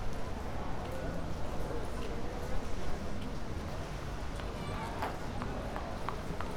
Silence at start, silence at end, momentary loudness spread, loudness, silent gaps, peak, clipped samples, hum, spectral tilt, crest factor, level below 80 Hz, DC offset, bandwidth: 0 s; 0 s; 2 LU; -40 LUFS; none; -18 dBFS; under 0.1%; none; -6 dB/octave; 16 dB; -42 dBFS; under 0.1%; 15.5 kHz